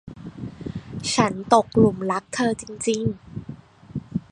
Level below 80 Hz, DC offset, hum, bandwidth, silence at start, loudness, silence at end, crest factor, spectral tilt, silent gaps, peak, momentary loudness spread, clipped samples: -50 dBFS; under 0.1%; none; 11 kHz; 0.05 s; -22 LUFS; 0.1 s; 22 dB; -5 dB/octave; none; -2 dBFS; 18 LU; under 0.1%